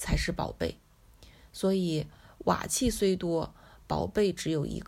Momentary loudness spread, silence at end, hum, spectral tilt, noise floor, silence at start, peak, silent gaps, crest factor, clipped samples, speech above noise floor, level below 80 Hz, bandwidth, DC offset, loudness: 8 LU; 0 s; none; -5 dB/octave; -56 dBFS; 0 s; -10 dBFS; none; 20 dB; under 0.1%; 27 dB; -44 dBFS; 16 kHz; under 0.1%; -30 LUFS